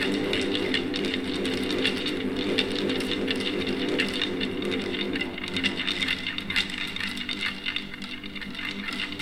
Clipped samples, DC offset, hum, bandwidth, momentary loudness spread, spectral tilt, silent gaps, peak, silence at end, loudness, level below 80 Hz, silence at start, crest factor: under 0.1%; under 0.1%; none; 16 kHz; 5 LU; -4 dB/octave; none; -6 dBFS; 0 s; -27 LUFS; -52 dBFS; 0 s; 22 dB